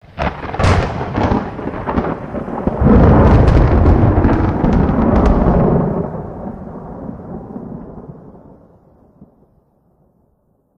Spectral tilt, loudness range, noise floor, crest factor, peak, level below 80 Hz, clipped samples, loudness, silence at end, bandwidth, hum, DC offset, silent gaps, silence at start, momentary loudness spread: -9 dB/octave; 20 LU; -59 dBFS; 14 dB; 0 dBFS; -20 dBFS; under 0.1%; -14 LUFS; 1.55 s; 9 kHz; none; under 0.1%; none; 0.15 s; 20 LU